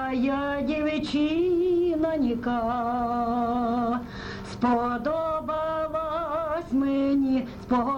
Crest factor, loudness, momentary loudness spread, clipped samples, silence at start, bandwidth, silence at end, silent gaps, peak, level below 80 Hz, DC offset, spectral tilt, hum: 12 dB; -26 LUFS; 5 LU; under 0.1%; 0 s; 9 kHz; 0 s; none; -14 dBFS; -48 dBFS; under 0.1%; -7 dB/octave; none